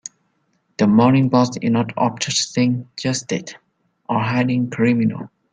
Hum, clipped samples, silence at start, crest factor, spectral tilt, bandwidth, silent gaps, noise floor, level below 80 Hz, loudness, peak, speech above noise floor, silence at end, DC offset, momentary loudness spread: none; under 0.1%; 0.8 s; 16 dB; -5.5 dB/octave; 9.4 kHz; none; -66 dBFS; -58 dBFS; -19 LUFS; -2 dBFS; 48 dB; 0.25 s; under 0.1%; 12 LU